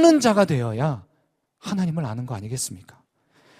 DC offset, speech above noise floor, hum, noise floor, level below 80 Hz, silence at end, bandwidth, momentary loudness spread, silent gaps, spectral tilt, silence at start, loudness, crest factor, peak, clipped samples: under 0.1%; 48 dB; none; -69 dBFS; -58 dBFS; 0.8 s; 15.5 kHz; 16 LU; none; -5.5 dB/octave; 0 s; -23 LUFS; 20 dB; -4 dBFS; under 0.1%